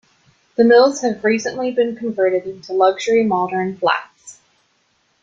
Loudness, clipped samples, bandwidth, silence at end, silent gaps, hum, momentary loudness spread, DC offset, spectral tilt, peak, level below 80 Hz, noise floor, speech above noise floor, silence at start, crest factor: -17 LUFS; under 0.1%; 7.8 kHz; 0.9 s; none; none; 10 LU; under 0.1%; -4.5 dB/octave; -2 dBFS; -64 dBFS; -63 dBFS; 46 dB; 0.6 s; 16 dB